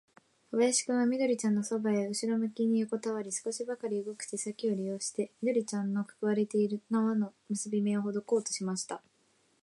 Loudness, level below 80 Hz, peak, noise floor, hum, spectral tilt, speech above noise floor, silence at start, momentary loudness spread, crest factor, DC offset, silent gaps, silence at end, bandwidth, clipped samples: -32 LUFS; -84 dBFS; -16 dBFS; -70 dBFS; none; -4.5 dB/octave; 39 dB; 0.5 s; 8 LU; 16 dB; under 0.1%; none; 0.65 s; 11.5 kHz; under 0.1%